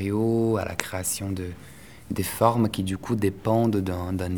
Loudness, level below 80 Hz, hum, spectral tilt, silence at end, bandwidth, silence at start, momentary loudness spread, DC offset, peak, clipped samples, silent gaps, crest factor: -25 LUFS; -50 dBFS; none; -5.5 dB/octave; 0 s; over 20 kHz; 0 s; 11 LU; 0.3%; 0 dBFS; under 0.1%; none; 26 dB